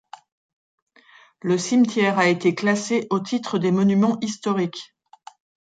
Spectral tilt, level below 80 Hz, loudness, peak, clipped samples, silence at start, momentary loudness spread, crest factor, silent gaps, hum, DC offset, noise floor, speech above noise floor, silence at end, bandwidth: -5.5 dB/octave; -70 dBFS; -21 LUFS; -6 dBFS; under 0.1%; 1.45 s; 7 LU; 18 dB; none; none; under 0.1%; -53 dBFS; 32 dB; 0.85 s; 9.2 kHz